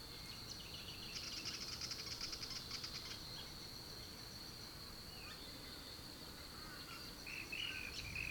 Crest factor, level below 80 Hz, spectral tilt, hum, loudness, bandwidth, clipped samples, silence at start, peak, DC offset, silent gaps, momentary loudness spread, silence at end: 18 dB; -62 dBFS; -2 dB/octave; none; -47 LUFS; 19 kHz; under 0.1%; 0 s; -32 dBFS; under 0.1%; none; 7 LU; 0 s